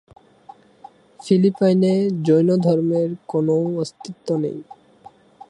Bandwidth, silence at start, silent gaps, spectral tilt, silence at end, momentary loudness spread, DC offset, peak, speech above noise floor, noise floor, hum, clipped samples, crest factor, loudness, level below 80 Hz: 10.5 kHz; 1.25 s; none; -8 dB/octave; 0.9 s; 12 LU; under 0.1%; -4 dBFS; 29 dB; -48 dBFS; none; under 0.1%; 16 dB; -19 LUFS; -66 dBFS